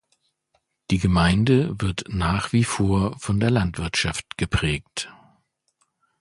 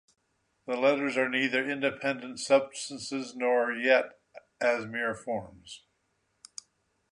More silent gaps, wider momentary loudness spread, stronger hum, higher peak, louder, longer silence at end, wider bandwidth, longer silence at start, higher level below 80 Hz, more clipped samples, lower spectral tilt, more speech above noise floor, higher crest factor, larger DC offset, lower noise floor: neither; second, 9 LU vs 20 LU; neither; first, -6 dBFS vs -10 dBFS; first, -23 LUFS vs -29 LUFS; second, 1.1 s vs 1.35 s; about the same, 11.5 kHz vs 11 kHz; first, 0.9 s vs 0.65 s; first, -38 dBFS vs -72 dBFS; neither; first, -5.5 dB/octave vs -3.5 dB/octave; about the same, 49 dB vs 47 dB; about the same, 18 dB vs 20 dB; neither; second, -71 dBFS vs -75 dBFS